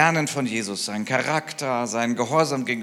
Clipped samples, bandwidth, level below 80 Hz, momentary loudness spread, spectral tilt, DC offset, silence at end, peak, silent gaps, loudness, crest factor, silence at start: under 0.1%; 16 kHz; -76 dBFS; 5 LU; -4 dB/octave; under 0.1%; 0 s; -4 dBFS; none; -24 LUFS; 20 dB; 0 s